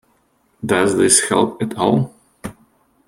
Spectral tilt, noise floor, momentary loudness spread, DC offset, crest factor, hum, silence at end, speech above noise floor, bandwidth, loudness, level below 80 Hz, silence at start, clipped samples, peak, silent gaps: -3.5 dB/octave; -61 dBFS; 22 LU; under 0.1%; 18 dB; none; 0.55 s; 45 dB; 16 kHz; -16 LUFS; -54 dBFS; 0.65 s; under 0.1%; 0 dBFS; none